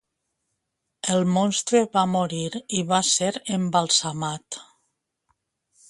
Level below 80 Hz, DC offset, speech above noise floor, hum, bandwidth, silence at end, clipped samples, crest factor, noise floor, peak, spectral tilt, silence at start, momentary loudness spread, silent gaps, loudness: -66 dBFS; under 0.1%; 56 dB; none; 11.5 kHz; 1.25 s; under 0.1%; 20 dB; -79 dBFS; -6 dBFS; -3.5 dB/octave; 1.05 s; 10 LU; none; -23 LUFS